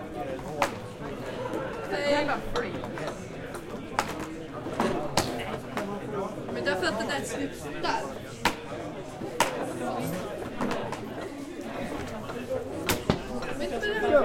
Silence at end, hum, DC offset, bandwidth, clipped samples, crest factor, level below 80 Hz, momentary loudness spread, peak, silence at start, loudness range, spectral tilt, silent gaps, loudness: 0 s; none; under 0.1%; 16.5 kHz; under 0.1%; 26 dB; -48 dBFS; 10 LU; -6 dBFS; 0 s; 2 LU; -4.5 dB/octave; none; -31 LUFS